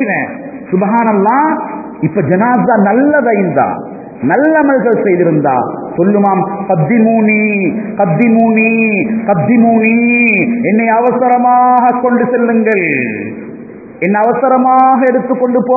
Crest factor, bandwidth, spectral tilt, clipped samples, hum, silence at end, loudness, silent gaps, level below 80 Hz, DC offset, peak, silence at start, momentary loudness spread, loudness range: 10 dB; 2.7 kHz; -12.5 dB/octave; under 0.1%; none; 0 s; -10 LUFS; none; -54 dBFS; under 0.1%; 0 dBFS; 0 s; 10 LU; 2 LU